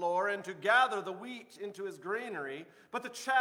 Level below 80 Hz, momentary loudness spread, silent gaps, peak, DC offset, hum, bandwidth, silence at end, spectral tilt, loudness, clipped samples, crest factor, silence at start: -90 dBFS; 16 LU; none; -14 dBFS; under 0.1%; none; 18.5 kHz; 0 s; -3 dB/octave; -34 LUFS; under 0.1%; 18 dB; 0 s